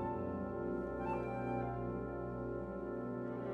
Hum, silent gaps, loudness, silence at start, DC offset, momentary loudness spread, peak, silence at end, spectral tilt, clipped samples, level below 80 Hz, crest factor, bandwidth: 60 Hz at -60 dBFS; none; -41 LUFS; 0 s; under 0.1%; 3 LU; -28 dBFS; 0 s; -10 dB/octave; under 0.1%; -56 dBFS; 12 dB; 7.6 kHz